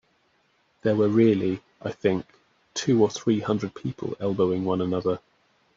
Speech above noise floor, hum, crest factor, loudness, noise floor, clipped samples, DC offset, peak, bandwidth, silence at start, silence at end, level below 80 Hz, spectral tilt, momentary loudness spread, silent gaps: 43 dB; none; 18 dB; -25 LUFS; -67 dBFS; under 0.1%; under 0.1%; -8 dBFS; 7.8 kHz; 0.85 s; 0.6 s; -64 dBFS; -6.5 dB/octave; 12 LU; none